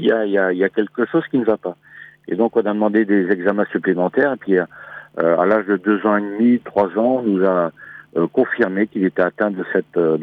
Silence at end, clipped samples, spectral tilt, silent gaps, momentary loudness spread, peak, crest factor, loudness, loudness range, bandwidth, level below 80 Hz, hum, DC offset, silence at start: 0 s; under 0.1%; -9.5 dB/octave; none; 8 LU; -2 dBFS; 16 dB; -18 LUFS; 1 LU; 4.7 kHz; -66 dBFS; none; under 0.1%; 0 s